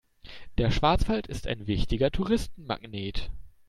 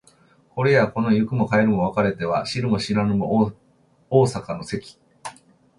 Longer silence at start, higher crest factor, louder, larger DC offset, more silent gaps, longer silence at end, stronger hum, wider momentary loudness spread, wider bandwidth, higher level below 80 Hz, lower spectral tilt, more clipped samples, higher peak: second, 0.25 s vs 0.55 s; about the same, 18 dB vs 18 dB; second, -29 LUFS vs -21 LUFS; neither; neither; second, 0.2 s vs 0.5 s; neither; about the same, 14 LU vs 15 LU; first, 13 kHz vs 11.5 kHz; first, -36 dBFS vs -52 dBFS; about the same, -6.5 dB/octave vs -7 dB/octave; neither; second, -10 dBFS vs -4 dBFS